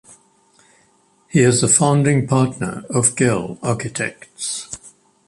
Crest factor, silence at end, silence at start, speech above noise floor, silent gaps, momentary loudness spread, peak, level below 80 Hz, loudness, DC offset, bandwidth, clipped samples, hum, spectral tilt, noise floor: 20 dB; 0.4 s; 1.35 s; 40 dB; none; 14 LU; 0 dBFS; -54 dBFS; -18 LUFS; under 0.1%; 11.5 kHz; under 0.1%; none; -4.5 dB/octave; -58 dBFS